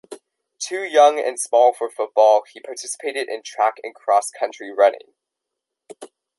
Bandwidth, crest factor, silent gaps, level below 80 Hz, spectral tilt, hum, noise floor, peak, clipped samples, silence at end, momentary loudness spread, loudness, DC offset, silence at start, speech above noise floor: 12 kHz; 18 dB; none; -82 dBFS; 0 dB/octave; none; -83 dBFS; -2 dBFS; under 0.1%; 0.35 s; 15 LU; -19 LUFS; under 0.1%; 0.1 s; 63 dB